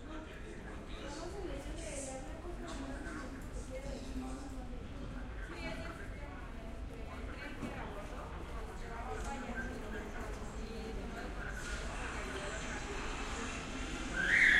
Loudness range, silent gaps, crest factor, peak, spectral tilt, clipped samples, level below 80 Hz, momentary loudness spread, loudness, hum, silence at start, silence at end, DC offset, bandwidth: 4 LU; none; 24 dB; -16 dBFS; -4 dB/octave; under 0.1%; -46 dBFS; 6 LU; -42 LUFS; none; 0 s; 0 s; under 0.1%; 14 kHz